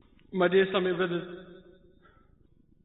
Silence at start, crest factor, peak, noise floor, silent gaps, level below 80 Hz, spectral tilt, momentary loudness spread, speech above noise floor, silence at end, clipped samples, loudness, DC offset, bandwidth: 0.3 s; 18 dB; -12 dBFS; -62 dBFS; none; -64 dBFS; -10 dB/octave; 18 LU; 35 dB; 1.3 s; under 0.1%; -27 LUFS; under 0.1%; 4.1 kHz